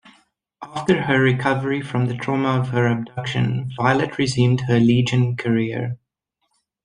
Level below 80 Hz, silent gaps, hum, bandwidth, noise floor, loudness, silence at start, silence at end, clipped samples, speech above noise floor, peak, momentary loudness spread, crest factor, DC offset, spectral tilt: -54 dBFS; none; none; 10 kHz; -74 dBFS; -20 LUFS; 0.6 s; 0.9 s; under 0.1%; 55 dB; -2 dBFS; 8 LU; 18 dB; under 0.1%; -6.5 dB/octave